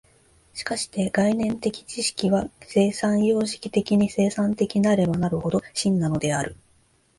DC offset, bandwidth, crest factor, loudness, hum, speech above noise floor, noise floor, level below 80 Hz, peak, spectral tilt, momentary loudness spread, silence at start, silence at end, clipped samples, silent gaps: under 0.1%; 11.5 kHz; 16 dB; -23 LUFS; none; 39 dB; -62 dBFS; -52 dBFS; -8 dBFS; -5.5 dB/octave; 7 LU; 0.55 s; 0.65 s; under 0.1%; none